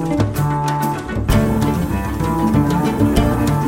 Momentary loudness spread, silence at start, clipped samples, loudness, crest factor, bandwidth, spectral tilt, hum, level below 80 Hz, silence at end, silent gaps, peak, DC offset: 5 LU; 0 s; under 0.1%; -17 LUFS; 14 dB; 16.5 kHz; -7 dB/octave; none; -26 dBFS; 0 s; none; -2 dBFS; under 0.1%